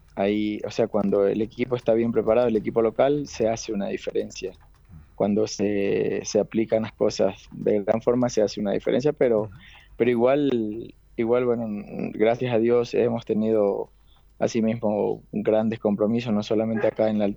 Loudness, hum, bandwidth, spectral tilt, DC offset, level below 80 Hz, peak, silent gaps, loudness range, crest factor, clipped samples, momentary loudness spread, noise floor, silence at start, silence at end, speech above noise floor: -24 LUFS; none; 19.5 kHz; -6.5 dB/octave; under 0.1%; -54 dBFS; -6 dBFS; none; 3 LU; 16 dB; under 0.1%; 8 LU; -49 dBFS; 0.15 s; 0 s; 26 dB